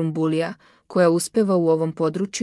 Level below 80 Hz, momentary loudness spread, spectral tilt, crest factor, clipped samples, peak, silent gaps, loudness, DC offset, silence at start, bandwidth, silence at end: -68 dBFS; 7 LU; -6 dB/octave; 14 dB; under 0.1%; -8 dBFS; none; -21 LUFS; under 0.1%; 0 s; 12 kHz; 0 s